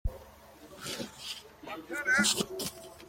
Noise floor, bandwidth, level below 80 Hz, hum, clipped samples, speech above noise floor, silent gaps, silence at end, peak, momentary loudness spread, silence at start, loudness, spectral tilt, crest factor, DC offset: -53 dBFS; 16.5 kHz; -48 dBFS; none; under 0.1%; 21 dB; none; 0 s; -14 dBFS; 18 LU; 0.05 s; -31 LUFS; -2 dB/octave; 20 dB; under 0.1%